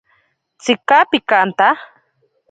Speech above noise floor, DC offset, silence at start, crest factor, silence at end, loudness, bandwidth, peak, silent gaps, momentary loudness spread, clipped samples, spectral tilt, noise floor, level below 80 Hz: 48 dB; under 0.1%; 0.65 s; 16 dB; 0.65 s; -15 LUFS; 9.2 kHz; 0 dBFS; none; 10 LU; under 0.1%; -3.5 dB/octave; -62 dBFS; -66 dBFS